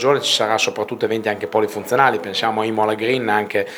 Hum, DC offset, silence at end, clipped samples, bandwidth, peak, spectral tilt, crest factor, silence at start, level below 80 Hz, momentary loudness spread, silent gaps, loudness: none; under 0.1%; 0 s; under 0.1%; 20 kHz; 0 dBFS; -3.5 dB/octave; 18 dB; 0 s; -68 dBFS; 5 LU; none; -19 LUFS